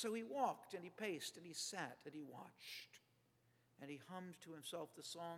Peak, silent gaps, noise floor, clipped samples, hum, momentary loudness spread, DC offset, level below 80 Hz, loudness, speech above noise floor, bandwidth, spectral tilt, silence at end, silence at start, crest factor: -28 dBFS; none; -78 dBFS; under 0.1%; none; 13 LU; under 0.1%; under -90 dBFS; -49 LUFS; 29 dB; 17.5 kHz; -3 dB/octave; 0 s; 0 s; 22 dB